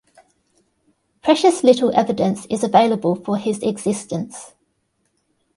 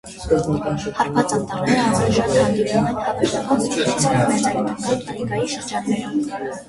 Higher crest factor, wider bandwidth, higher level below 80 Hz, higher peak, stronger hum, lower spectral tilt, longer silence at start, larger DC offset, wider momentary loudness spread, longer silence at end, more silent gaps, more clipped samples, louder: about the same, 20 dB vs 16 dB; about the same, 11.5 kHz vs 11.5 kHz; second, -60 dBFS vs -44 dBFS; first, 0 dBFS vs -4 dBFS; neither; about the same, -5.5 dB/octave vs -5 dB/octave; first, 1.25 s vs 0.05 s; neither; first, 12 LU vs 6 LU; first, 1.1 s vs 0.05 s; neither; neither; about the same, -18 LUFS vs -20 LUFS